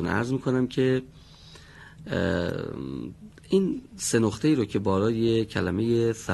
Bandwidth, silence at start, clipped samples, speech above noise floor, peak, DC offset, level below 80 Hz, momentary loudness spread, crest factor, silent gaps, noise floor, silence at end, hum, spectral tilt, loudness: 12 kHz; 0 s; under 0.1%; 23 dB; -8 dBFS; under 0.1%; -52 dBFS; 10 LU; 18 dB; none; -49 dBFS; 0 s; none; -6 dB/octave; -26 LUFS